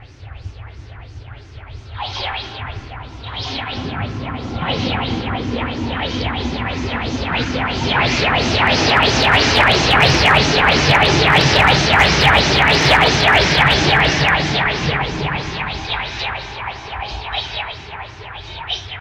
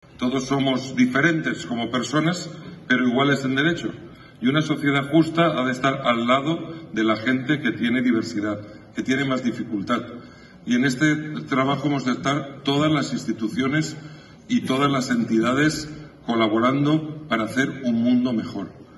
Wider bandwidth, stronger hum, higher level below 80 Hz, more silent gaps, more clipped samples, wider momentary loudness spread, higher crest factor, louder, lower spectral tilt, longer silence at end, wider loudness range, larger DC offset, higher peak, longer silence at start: first, 16.5 kHz vs 12 kHz; neither; first, -32 dBFS vs -58 dBFS; neither; neither; first, 18 LU vs 11 LU; about the same, 16 dB vs 18 dB; first, -15 LUFS vs -22 LUFS; second, -4 dB/octave vs -5.5 dB/octave; about the same, 0 s vs 0 s; first, 15 LU vs 3 LU; neither; first, 0 dBFS vs -4 dBFS; second, 0 s vs 0.2 s